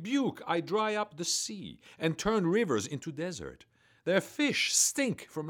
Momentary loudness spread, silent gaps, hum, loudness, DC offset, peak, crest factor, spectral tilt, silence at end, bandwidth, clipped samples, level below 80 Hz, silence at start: 13 LU; none; none; -30 LUFS; under 0.1%; -14 dBFS; 18 dB; -3 dB/octave; 0 s; 19 kHz; under 0.1%; -62 dBFS; 0 s